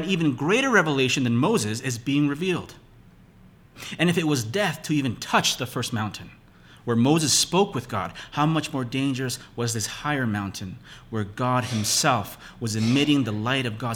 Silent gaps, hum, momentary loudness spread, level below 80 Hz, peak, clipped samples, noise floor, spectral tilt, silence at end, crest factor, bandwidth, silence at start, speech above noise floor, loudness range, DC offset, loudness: none; none; 12 LU; -56 dBFS; -6 dBFS; under 0.1%; -52 dBFS; -4 dB/octave; 0 s; 18 dB; 18 kHz; 0 s; 28 dB; 4 LU; under 0.1%; -24 LUFS